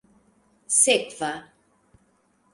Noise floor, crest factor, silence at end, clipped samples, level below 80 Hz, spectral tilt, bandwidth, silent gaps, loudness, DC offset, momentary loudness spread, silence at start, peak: -65 dBFS; 24 dB; 1.1 s; under 0.1%; -70 dBFS; -0.5 dB/octave; 11.5 kHz; none; -21 LUFS; under 0.1%; 14 LU; 0.7 s; -4 dBFS